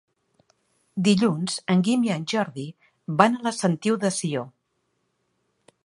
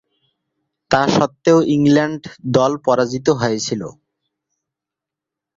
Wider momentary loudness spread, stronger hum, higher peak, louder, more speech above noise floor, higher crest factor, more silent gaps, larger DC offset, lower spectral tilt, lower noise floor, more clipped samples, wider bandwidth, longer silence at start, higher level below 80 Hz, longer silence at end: first, 16 LU vs 10 LU; neither; about the same, -2 dBFS vs -2 dBFS; second, -23 LUFS vs -16 LUFS; second, 51 dB vs 69 dB; first, 24 dB vs 16 dB; neither; neither; about the same, -5.5 dB/octave vs -5.5 dB/octave; second, -74 dBFS vs -85 dBFS; neither; first, 11.5 kHz vs 7.8 kHz; about the same, 0.95 s vs 0.9 s; second, -68 dBFS vs -54 dBFS; second, 1.35 s vs 1.65 s